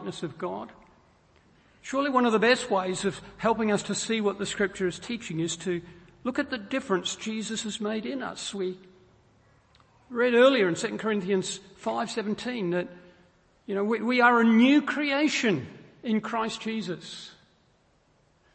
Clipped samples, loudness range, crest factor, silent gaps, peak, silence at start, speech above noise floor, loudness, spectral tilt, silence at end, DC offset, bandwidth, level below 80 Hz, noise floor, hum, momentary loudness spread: under 0.1%; 7 LU; 22 dB; none; -6 dBFS; 0 s; 39 dB; -27 LUFS; -4.5 dB/octave; 1.25 s; under 0.1%; 8.8 kHz; -64 dBFS; -65 dBFS; none; 15 LU